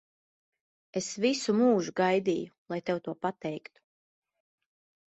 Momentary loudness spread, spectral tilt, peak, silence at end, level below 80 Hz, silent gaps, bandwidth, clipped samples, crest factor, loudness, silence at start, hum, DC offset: 13 LU; -5 dB/octave; -14 dBFS; 1.5 s; -74 dBFS; 2.58-2.66 s; 8.4 kHz; under 0.1%; 18 dB; -30 LUFS; 0.95 s; none; under 0.1%